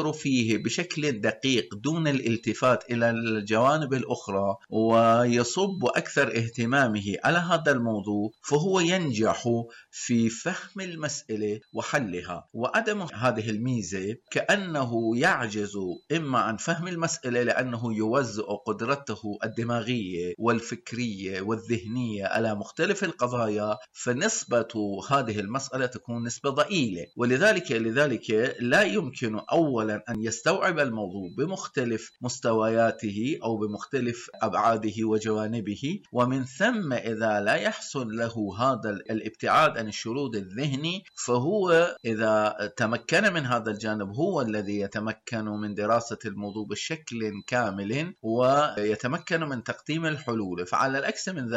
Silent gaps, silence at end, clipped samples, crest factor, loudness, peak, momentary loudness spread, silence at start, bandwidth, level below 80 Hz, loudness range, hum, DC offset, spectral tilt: none; 0 s; under 0.1%; 16 dB; -27 LUFS; -12 dBFS; 9 LU; 0 s; 11.5 kHz; -66 dBFS; 5 LU; none; under 0.1%; -5 dB/octave